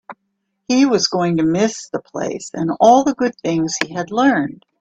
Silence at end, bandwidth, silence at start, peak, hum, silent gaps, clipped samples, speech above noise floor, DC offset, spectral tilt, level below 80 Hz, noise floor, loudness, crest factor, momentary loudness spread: 0.25 s; 8.4 kHz; 0.1 s; 0 dBFS; none; none; under 0.1%; 55 dB; under 0.1%; -4.5 dB/octave; -56 dBFS; -72 dBFS; -17 LUFS; 18 dB; 13 LU